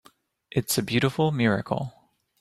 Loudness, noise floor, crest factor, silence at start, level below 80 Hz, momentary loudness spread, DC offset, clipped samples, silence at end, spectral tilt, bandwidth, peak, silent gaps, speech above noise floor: -25 LUFS; -52 dBFS; 18 dB; 0.55 s; -58 dBFS; 8 LU; under 0.1%; under 0.1%; 0.5 s; -5 dB/octave; 16 kHz; -8 dBFS; none; 27 dB